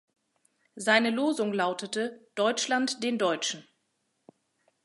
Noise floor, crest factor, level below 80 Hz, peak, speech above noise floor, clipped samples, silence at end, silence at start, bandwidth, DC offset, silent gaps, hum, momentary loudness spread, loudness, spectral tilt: -77 dBFS; 24 dB; -84 dBFS; -6 dBFS; 49 dB; under 0.1%; 1.25 s; 0.75 s; 11.5 kHz; under 0.1%; none; none; 9 LU; -28 LUFS; -3 dB/octave